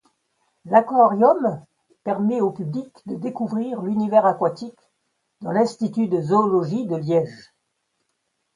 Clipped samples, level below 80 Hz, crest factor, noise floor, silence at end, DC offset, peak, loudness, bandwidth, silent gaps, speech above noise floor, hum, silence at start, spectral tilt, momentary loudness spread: under 0.1%; -70 dBFS; 20 dB; -74 dBFS; 1.15 s; under 0.1%; 0 dBFS; -21 LUFS; 10.5 kHz; none; 54 dB; none; 0.65 s; -8 dB/octave; 15 LU